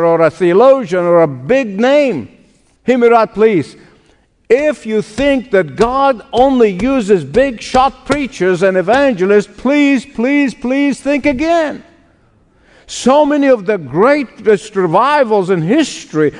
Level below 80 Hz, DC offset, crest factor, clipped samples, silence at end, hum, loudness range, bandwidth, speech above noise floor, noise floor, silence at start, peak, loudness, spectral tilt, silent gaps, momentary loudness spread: -42 dBFS; under 0.1%; 12 dB; 0.2%; 0 s; none; 3 LU; 10.5 kHz; 40 dB; -52 dBFS; 0 s; 0 dBFS; -12 LUFS; -6 dB/octave; none; 7 LU